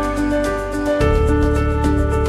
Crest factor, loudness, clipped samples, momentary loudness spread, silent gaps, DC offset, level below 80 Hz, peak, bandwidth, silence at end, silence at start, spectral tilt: 12 dB; -18 LUFS; under 0.1%; 4 LU; none; under 0.1%; -22 dBFS; -4 dBFS; 13.5 kHz; 0 s; 0 s; -7 dB/octave